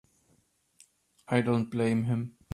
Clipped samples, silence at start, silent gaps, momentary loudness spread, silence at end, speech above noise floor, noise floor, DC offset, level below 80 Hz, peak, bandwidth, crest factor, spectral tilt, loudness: under 0.1%; 1.3 s; none; 5 LU; 0.25 s; 42 dB; -69 dBFS; under 0.1%; -66 dBFS; -10 dBFS; 11.5 kHz; 20 dB; -7.5 dB/octave; -29 LUFS